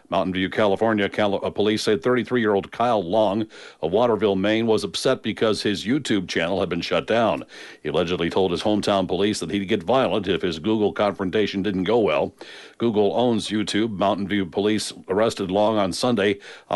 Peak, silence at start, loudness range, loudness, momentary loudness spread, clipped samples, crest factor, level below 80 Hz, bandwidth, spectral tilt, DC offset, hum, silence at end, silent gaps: -8 dBFS; 0.1 s; 1 LU; -22 LUFS; 4 LU; under 0.1%; 14 dB; -56 dBFS; 11.5 kHz; -5 dB/octave; under 0.1%; none; 0 s; none